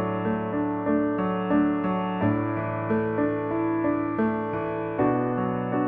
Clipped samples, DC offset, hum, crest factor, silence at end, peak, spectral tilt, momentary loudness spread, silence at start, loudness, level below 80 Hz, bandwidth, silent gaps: under 0.1%; under 0.1%; none; 14 dB; 0 s; -10 dBFS; -11.5 dB/octave; 4 LU; 0 s; -26 LUFS; -54 dBFS; 3.8 kHz; none